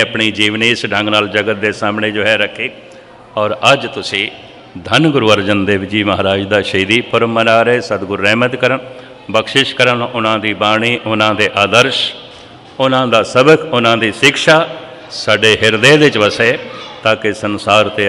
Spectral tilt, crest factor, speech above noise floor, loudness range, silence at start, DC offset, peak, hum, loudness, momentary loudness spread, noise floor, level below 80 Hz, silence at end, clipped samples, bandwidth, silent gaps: -4.5 dB/octave; 12 dB; 23 dB; 4 LU; 0 s; under 0.1%; 0 dBFS; none; -12 LUFS; 9 LU; -35 dBFS; -52 dBFS; 0 s; 0.6%; 15 kHz; none